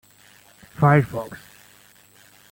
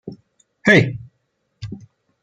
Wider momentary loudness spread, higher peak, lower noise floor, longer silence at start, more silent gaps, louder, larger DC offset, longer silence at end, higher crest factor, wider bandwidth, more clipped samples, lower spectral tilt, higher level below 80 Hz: about the same, 25 LU vs 25 LU; about the same, -4 dBFS vs -2 dBFS; second, -53 dBFS vs -70 dBFS; first, 0.8 s vs 0.05 s; neither; second, -20 LUFS vs -16 LUFS; neither; first, 1.15 s vs 0.45 s; about the same, 20 dB vs 20 dB; first, 17 kHz vs 9.6 kHz; neither; first, -8 dB/octave vs -6 dB/octave; about the same, -56 dBFS vs -54 dBFS